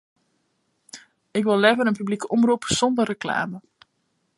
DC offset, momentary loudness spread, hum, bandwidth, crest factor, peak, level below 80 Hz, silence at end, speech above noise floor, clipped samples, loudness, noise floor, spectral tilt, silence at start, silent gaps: under 0.1%; 25 LU; none; 11.5 kHz; 22 dB; -2 dBFS; -60 dBFS; 0.8 s; 50 dB; under 0.1%; -22 LUFS; -71 dBFS; -4 dB/octave; 0.95 s; none